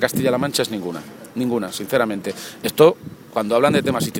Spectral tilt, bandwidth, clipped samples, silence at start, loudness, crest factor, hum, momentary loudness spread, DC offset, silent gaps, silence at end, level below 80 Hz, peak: -5 dB/octave; 17 kHz; under 0.1%; 0 s; -20 LUFS; 20 dB; none; 15 LU; under 0.1%; none; 0 s; -56 dBFS; 0 dBFS